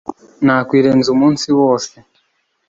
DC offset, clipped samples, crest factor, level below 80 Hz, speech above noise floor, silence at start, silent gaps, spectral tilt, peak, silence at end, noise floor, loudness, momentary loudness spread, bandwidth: under 0.1%; under 0.1%; 14 dB; -54 dBFS; 51 dB; 0.1 s; none; -5.5 dB/octave; -2 dBFS; 0.8 s; -64 dBFS; -13 LUFS; 9 LU; 7.8 kHz